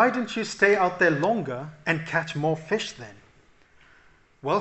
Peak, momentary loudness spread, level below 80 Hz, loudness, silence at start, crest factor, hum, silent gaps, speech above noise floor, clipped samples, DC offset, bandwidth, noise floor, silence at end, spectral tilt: -4 dBFS; 14 LU; -64 dBFS; -25 LUFS; 0 s; 20 dB; none; none; 33 dB; under 0.1%; under 0.1%; 8.4 kHz; -57 dBFS; 0 s; -5 dB/octave